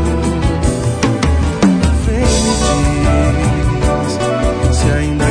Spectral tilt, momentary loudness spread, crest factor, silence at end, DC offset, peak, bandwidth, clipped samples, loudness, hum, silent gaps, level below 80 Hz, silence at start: -5.5 dB/octave; 3 LU; 12 dB; 0 s; under 0.1%; 0 dBFS; 10 kHz; under 0.1%; -14 LUFS; none; none; -18 dBFS; 0 s